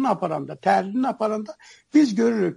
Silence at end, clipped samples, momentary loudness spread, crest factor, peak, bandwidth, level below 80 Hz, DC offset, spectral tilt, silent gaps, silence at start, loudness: 0 s; under 0.1%; 9 LU; 16 dB; -6 dBFS; 11 kHz; -72 dBFS; under 0.1%; -6.5 dB/octave; none; 0 s; -22 LUFS